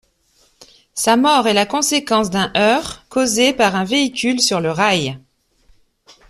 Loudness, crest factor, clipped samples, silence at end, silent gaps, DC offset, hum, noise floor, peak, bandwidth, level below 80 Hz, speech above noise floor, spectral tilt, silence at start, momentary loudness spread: -16 LUFS; 16 dB; under 0.1%; 1.1 s; none; under 0.1%; none; -58 dBFS; -2 dBFS; 15 kHz; -52 dBFS; 42 dB; -3 dB/octave; 0.95 s; 7 LU